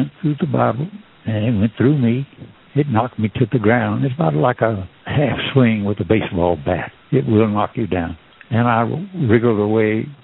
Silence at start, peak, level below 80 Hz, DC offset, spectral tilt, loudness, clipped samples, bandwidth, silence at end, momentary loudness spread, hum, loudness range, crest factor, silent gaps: 0 s; 0 dBFS; -50 dBFS; under 0.1%; -6.5 dB/octave; -18 LUFS; under 0.1%; 4.1 kHz; 0.1 s; 8 LU; none; 2 LU; 18 dB; none